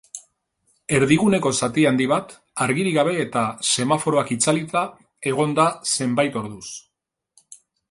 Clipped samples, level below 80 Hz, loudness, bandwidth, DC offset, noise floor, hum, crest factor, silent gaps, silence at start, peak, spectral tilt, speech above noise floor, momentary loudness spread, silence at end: under 0.1%; -58 dBFS; -20 LUFS; 11.5 kHz; under 0.1%; -67 dBFS; none; 18 dB; none; 0.15 s; -4 dBFS; -4 dB/octave; 47 dB; 15 LU; 0.35 s